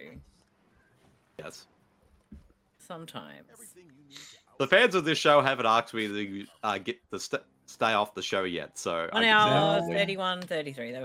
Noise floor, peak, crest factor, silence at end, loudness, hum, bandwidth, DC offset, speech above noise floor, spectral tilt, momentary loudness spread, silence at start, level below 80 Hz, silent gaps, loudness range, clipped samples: -66 dBFS; -6 dBFS; 24 dB; 0 s; -26 LUFS; none; 16 kHz; under 0.1%; 38 dB; -4 dB/octave; 23 LU; 0 s; -68 dBFS; none; 22 LU; under 0.1%